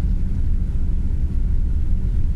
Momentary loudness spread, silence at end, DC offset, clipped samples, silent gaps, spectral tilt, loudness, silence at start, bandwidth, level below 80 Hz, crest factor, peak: 1 LU; 0 s; under 0.1%; under 0.1%; none; -9.5 dB/octave; -24 LUFS; 0 s; 2.2 kHz; -18 dBFS; 10 dB; -8 dBFS